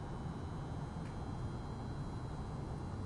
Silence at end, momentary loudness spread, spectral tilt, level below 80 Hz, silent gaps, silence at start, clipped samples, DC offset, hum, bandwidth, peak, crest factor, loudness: 0 s; 1 LU; -7.5 dB/octave; -50 dBFS; none; 0 s; under 0.1%; under 0.1%; none; 11.5 kHz; -32 dBFS; 12 dB; -44 LUFS